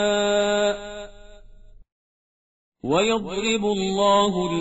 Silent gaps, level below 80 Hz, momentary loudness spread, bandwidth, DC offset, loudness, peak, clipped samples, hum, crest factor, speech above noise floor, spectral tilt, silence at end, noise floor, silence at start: 1.92-2.72 s; -48 dBFS; 17 LU; 8 kHz; 0.2%; -21 LUFS; -6 dBFS; under 0.1%; none; 16 dB; 26 dB; -3 dB/octave; 0 s; -47 dBFS; 0 s